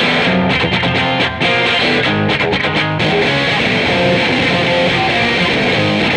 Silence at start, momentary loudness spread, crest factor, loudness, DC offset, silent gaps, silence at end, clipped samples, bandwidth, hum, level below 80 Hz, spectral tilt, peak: 0 s; 2 LU; 12 dB; -13 LUFS; under 0.1%; none; 0 s; under 0.1%; 11.5 kHz; none; -38 dBFS; -5 dB/octave; -2 dBFS